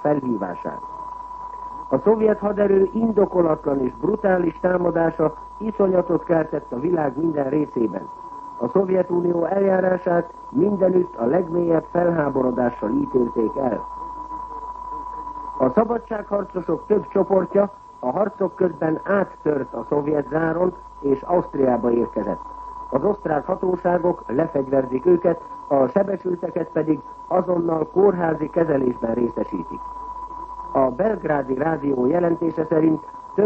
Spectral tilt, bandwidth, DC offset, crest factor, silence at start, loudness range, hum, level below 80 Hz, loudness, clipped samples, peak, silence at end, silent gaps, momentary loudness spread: -10.5 dB/octave; 5.8 kHz; under 0.1%; 18 dB; 0 s; 3 LU; none; -50 dBFS; -21 LUFS; under 0.1%; -2 dBFS; 0 s; none; 13 LU